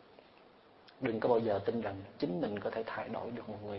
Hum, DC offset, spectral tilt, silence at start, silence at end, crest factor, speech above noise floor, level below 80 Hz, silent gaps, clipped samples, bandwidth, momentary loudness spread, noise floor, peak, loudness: none; under 0.1%; -5.5 dB/octave; 0.4 s; 0 s; 20 dB; 25 dB; -70 dBFS; none; under 0.1%; 5.6 kHz; 10 LU; -61 dBFS; -16 dBFS; -36 LUFS